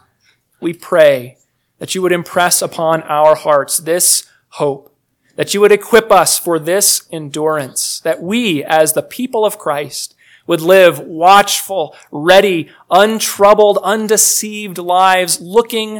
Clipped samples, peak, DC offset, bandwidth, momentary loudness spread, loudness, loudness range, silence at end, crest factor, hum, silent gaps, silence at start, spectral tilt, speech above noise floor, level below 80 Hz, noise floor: 0.8%; 0 dBFS; under 0.1%; over 20 kHz; 13 LU; -12 LUFS; 4 LU; 0 s; 12 dB; none; none; 0.6 s; -2.5 dB/octave; 45 dB; -54 dBFS; -57 dBFS